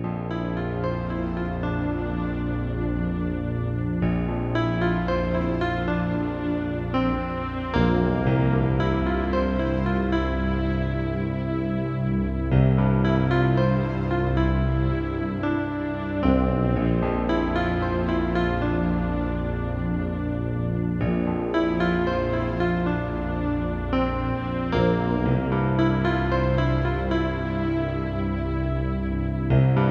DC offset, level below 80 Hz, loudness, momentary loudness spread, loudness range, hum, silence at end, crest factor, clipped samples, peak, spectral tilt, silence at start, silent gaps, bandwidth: under 0.1%; -32 dBFS; -24 LUFS; 6 LU; 3 LU; none; 0 s; 18 dB; under 0.1%; -6 dBFS; -9.5 dB/octave; 0 s; none; 6.2 kHz